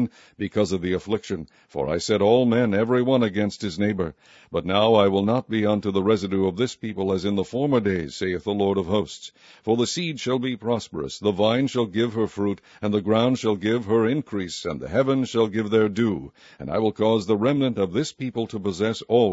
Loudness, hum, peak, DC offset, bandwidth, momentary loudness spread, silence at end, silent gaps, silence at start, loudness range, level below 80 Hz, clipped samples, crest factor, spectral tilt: -23 LUFS; none; -4 dBFS; under 0.1%; 8 kHz; 9 LU; 0 s; none; 0 s; 3 LU; -56 dBFS; under 0.1%; 20 dB; -6 dB/octave